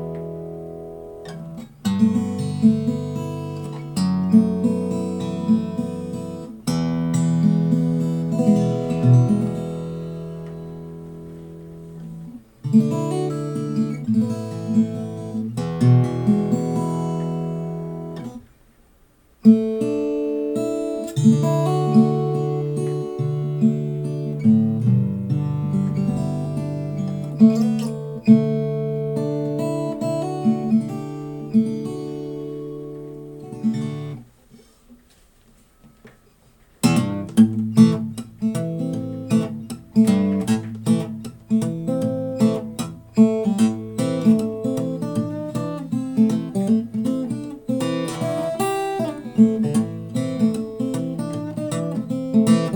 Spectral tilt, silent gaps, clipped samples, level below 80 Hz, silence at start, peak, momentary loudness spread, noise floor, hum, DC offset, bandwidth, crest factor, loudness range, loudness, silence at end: -8 dB/octave; none; under 0.1%; -54 dBFS; 0 s; -2 dBFS; 15 LU; -55 dBFS; none; under 0.1%; 18.5 kHz; 20 dB; 6 LU; -21 LUFS; 0 s